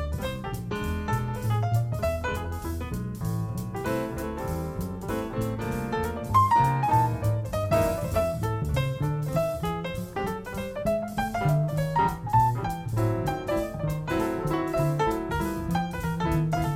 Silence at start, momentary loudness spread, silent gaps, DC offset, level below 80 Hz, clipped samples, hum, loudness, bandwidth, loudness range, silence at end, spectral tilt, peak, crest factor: 0 s; 9 LU; none; under 0.1%; -40 dBFS; under 0.1%; none; -28 LUFS; 16.5 kHz; 6 LU; 0 s; -7 dB/octave; -10 dBFS; 18 dB